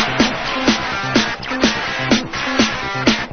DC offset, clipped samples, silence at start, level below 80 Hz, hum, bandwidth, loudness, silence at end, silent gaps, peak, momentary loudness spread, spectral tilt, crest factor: 0.3%; under 0.1%; 0 s; -40 dBFS; none; 6.8 kHz; -17 LUFS; 0 s; none; 0 dBFS; 2 LU; -3.5 dB/octave; 18 dB